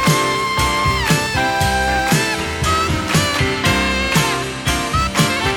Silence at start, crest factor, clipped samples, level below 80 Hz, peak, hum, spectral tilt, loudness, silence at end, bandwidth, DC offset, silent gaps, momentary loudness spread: 0 s; 16 dB; under 0.1%; -30 dBFS; -2 dBFS; none; -3.5 dB/octave; -16 LUFS; 0 s; 19.5 kHz; under 0.1%; none; 3 LU